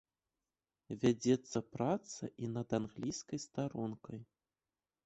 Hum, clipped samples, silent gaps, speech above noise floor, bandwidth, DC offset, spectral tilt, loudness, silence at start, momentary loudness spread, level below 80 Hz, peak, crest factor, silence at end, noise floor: none; under 0.1%; none; over 52 dB; 8.2 kHz; under 0.1%; -6 dB/octave; -38 LUFS; 0.9 s; 14 LU; -70 dBFS; -18 dBFS; 22 dB; 0.8 s; under -90 dBFS